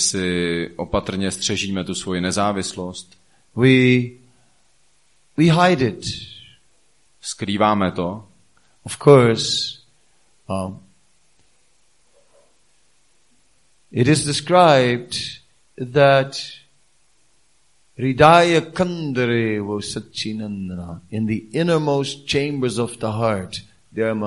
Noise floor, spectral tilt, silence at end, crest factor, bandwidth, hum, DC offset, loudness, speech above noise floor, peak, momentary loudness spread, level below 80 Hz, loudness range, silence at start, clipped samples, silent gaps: -62 dBFS; -5 dB/octave; 0 s; 20 dB; 11.5 kHz; none; 0.2%; -19 LUFS; 44 dB; 0 dBFS; 18 LU; -50 dBFS; 7 LU; 0 s; under 0.1%; none